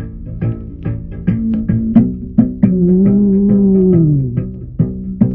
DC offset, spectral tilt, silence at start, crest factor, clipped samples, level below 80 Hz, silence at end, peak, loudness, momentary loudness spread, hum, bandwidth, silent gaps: under 0.1%; -14 dB/octave; 0 s; 14 dB; 0.2%; -30 dBFS; 0 s; 0 dBFS; -14 LUFS; 13 LU; none; 2.8 kHz; none